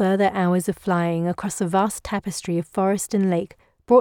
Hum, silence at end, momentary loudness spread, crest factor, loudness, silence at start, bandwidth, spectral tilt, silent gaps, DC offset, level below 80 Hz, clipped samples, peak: none; 0 s; 7 LU; 18 dB; -23 LUFS; 0 s; 17 kHz; -6 dB/octave; none; under 0.1%; -54 dBFS; under 0.1%; -4 dBFS